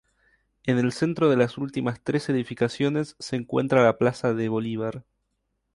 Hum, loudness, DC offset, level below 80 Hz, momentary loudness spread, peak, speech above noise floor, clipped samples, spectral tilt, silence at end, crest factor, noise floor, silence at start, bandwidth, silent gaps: none; -25 LUFS; under 0.1%; -62 dBFS; 10 LU; -6 dBFS; 52 dB; under 0.1%; -7 dB/octave; 0.75 s; 20 dB; -76 dBFS; 0.65 s; 11.5 kHz; none